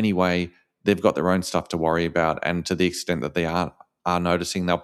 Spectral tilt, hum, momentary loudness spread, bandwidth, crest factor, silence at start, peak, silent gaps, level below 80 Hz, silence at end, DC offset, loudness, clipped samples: -5.5 dB/octave; none; 6 LU; 13.5 kHz; 18 dB; 0 s; -4 dBFS; none; -50 dBFS; 0 s; under 0.1%; -24 LUFS; under 0.1%